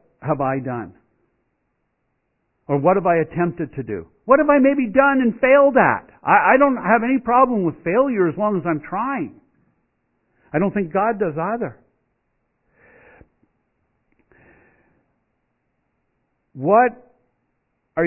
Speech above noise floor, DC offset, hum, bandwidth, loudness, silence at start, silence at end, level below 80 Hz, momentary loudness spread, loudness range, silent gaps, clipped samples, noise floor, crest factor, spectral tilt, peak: 54 dB; under 0.1%; none; 3.1 kHz; -18 LUFS; 0.2 s; 0 s; -56 dBFS; 14 LU; 10 LU; none; under 0.1%; -71 dBFS; 20 dB; -12 dB/octave; 0 dBFS